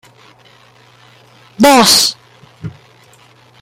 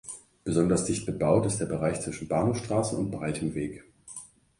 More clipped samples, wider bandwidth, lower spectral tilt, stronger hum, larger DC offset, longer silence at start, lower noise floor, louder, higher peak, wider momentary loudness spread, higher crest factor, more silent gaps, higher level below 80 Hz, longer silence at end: neither; first, over 20 kHz vs 11.5 kHz; second, -2 dB/octave vs -6 dB/octave; neither; neither; first, 1.6 s vs 0.05 s; about the same, -45 dBFS vs -47 dBFS; first, -8 LUFS vs -28 LUFS; first, 0 dBFS vs -10 dBFS; first, 25 LU vs 18 LU; about the same, 16 dB vs 18 dB; neither; about the same, -52 dBFS vs -52 dBFS; first, 0.95 s vs 0.35 s